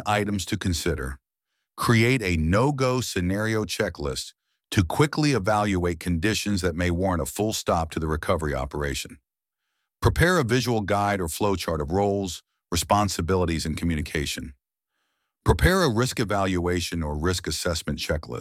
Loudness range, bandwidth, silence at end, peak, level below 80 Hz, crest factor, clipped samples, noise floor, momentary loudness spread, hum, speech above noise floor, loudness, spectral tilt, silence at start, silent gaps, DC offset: 2 LU; 16.5 kHz; 0 s; -4 dBFS; -38 dBFS; 20 dB; under 0.1%; -83 dBFS; 8 LU; none; 59 dB; -25 LUFS; -5 dB/octave; 0 s; none; under 0.1%